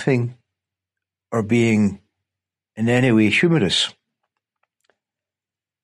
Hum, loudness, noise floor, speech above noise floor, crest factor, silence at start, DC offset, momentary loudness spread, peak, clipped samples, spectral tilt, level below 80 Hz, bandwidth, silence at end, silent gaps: none; -19 LUFS; -90 dBFS; 72 dB; 16 dB; 0 s; under 0.1%; 10 LU; -6 dBFS; under 0.1%; -5.5 dB/octave; -60 dBFS; 11.5 kHz; 1.95 s; none